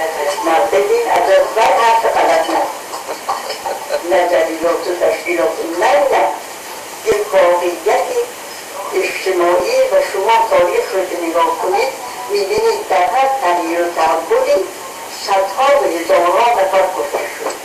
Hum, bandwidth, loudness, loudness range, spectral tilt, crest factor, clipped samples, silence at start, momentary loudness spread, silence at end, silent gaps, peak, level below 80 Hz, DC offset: none; 15.5 kHz; -14 LUFS; 2 LU; -2 dB/octave; 14 dB; under 0.1%; 0 s; 10 LU; 0 s; none; 0 dBFS; -52 dBFS; under 0.1%